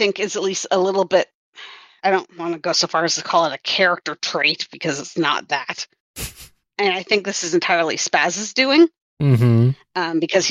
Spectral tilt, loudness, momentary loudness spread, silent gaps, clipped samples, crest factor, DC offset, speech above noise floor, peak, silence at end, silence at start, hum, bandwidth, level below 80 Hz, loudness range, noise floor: -4 dB/octave; -19 LUFS; 14 LU; 1.34-1.53 s, 6.00-6.14 s, 9.02-9.17 s; under 0.1%; 18 dB; under 0.1%; 23 dB; -2 dBFS; 0 s; 0 s; none; 15 kHz; -54 dBFS; 4 LU; -42 dBFS